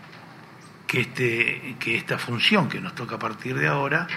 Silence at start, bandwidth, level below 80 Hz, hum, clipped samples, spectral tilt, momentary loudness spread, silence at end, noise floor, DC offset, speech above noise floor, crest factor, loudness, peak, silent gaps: 0 s; 15.5 kHz; -66 dBFS; none; under 0.1%; -5 dB/octave; 12 LU; 0 s; -46 dBFS; under 0.1%; 21 dB; 22 dB; -24 LUFS; -4 dBFS; none